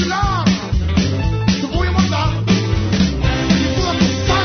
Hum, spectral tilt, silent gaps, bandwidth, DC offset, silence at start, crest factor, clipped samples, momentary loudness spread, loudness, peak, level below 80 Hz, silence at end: none; -5.5 dB/octave; none; 6.6 kHz; under 0.1%; 0 s; 14 dB; under 0.1%; 2 LU; -17 LUFS; -2 dBFS; -24 dBFS; 0 s